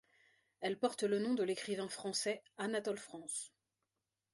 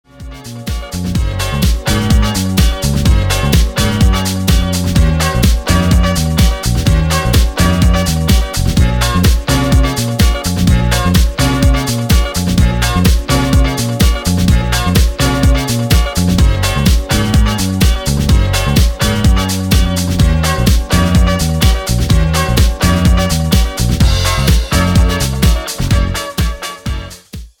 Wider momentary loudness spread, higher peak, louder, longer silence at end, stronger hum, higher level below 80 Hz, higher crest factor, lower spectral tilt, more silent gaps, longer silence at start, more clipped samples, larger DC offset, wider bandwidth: first, 8 LU vs 4 LU; second, -22 dBFS vs 0 dBFS; second, -39 LUFS vs -13 LUFS; first, 0.85 s vs 0.15 s; neither; second, -86 dBFS vs -14 dBFS; first, 20 dB vs 12 dB; second, -3.5 dB/octave vs -5 dB/octave; neither; first, 0.6 s vs 0.2 s; neither; neither; second, 11.5 kHz vs 18.5 kHz